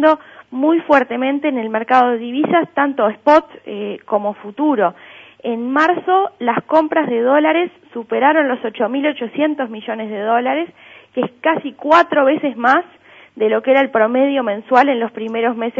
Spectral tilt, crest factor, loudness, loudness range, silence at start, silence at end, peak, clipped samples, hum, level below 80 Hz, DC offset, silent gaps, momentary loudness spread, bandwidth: -6.5 dB/octave; 16 dB; -16 LUFS; 3 LU; 0 s; 0 s; 0 dBFS; under 0.1%; none; -64 dBFS; under 0.1%; none; 10 LU; 7.6 kHz